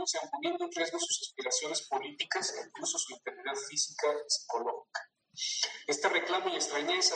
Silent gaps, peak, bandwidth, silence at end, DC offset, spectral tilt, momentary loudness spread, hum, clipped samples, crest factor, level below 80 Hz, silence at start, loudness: none; -14 dBFS; 9.6 kHz; 0 s; under 0.1%; 0.5 dB/octave; 8 LU; none; under 0.1%; 22 dB; under -90 dBFS; 0 s; -33 LUFS